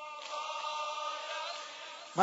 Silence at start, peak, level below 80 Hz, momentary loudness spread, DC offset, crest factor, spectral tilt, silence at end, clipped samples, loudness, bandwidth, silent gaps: 0 s; -12 dBFS; under -90 dBFS; 6 LU; under 0.1%; 26 dB; -1 dB/octave; 0 s; under 0.1%; -39 LUFS; 7.6 kHz; none